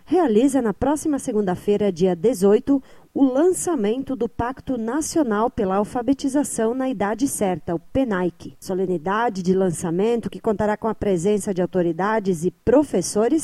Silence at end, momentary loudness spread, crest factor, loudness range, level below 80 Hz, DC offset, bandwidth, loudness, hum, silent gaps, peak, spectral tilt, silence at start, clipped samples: 0 s; 7 LU; 16 dB; 3 LU; -48 dBFS; under 0.1%; 15 kHz; -21 LUFS; none; none; -4 dBFS; -6 dB/octave; 0.1 s; under 0.1%